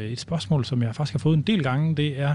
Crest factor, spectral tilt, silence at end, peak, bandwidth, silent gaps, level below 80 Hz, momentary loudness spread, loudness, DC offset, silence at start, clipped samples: 14 dB; -7 dB/octave; 0 s; -10 dBFS; 10.5 kHz; none; -56 dBFS; 5 LU; -24 LUFS; under 0.1%; 0 s; under 0.1%